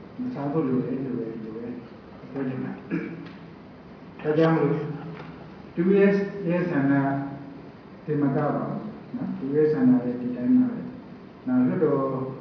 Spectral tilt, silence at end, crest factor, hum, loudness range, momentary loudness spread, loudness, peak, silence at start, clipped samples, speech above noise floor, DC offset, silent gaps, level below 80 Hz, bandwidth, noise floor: -8 dB/octave; 0 s; 16 dB; none; 7 LU; 21 LU; -25 LUFS; -8 dBFS; 0 s; under 0.1%; 21 dB; under 0.1%; none; -62 dBFS; 5.8 kHz; -45 dBFS